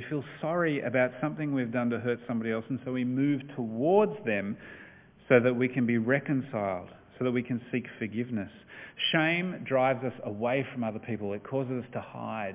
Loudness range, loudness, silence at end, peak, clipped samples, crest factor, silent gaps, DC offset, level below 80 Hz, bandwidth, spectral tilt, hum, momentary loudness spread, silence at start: 3 LU; -30 LUFS; 0 s; -8 dBFS; under 0.1%; 22 dB; none; under 0.1%; -66 dBFS; 3.8 kHz; -4.5 dB/octave; none; 12 LU; 0 s